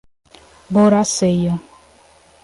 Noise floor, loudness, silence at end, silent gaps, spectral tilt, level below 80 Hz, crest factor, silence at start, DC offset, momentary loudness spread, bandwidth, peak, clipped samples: -50 dBFS; -16 LUFS; 0.85 s; none; -5.5 dB/octave; -50 dBFS; 16 dB; 0.7 s; under 0.1%; 9 LU; 11.5 kHz; -2 dBFS; under 0.1%